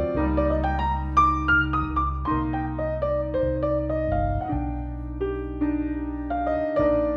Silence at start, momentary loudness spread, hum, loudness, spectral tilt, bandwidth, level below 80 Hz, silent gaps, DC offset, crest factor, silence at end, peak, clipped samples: 0 s; 8 LU; none; -25 LUFS; -8.5 dB/octave; 6.4 kHz; -32 dBFS; none; under 0.1%; 16 dB; 0 s; -8 dBFS; under 0.1%